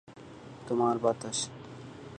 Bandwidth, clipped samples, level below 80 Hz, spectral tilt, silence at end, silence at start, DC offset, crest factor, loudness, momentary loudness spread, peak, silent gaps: 11.5 kHz; under 0.1%; -66 dBFS; -4.5 dB/octave; 0 s; 0.1 s; under 0.1%; 20 dB; -31 LUFS; 21 LU; -12 dBFS; none